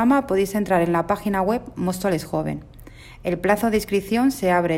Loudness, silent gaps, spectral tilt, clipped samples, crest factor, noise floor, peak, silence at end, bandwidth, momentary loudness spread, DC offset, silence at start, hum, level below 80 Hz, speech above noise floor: -22 LUFS; none; -6 dB/octave; under 0.1%; 16 dB; -42 dBFS; -6 dBFS; 0 s; 16.5 kHz; 7 LU; under 0.1%; 0 s; none; -46 dBFS; 21 dB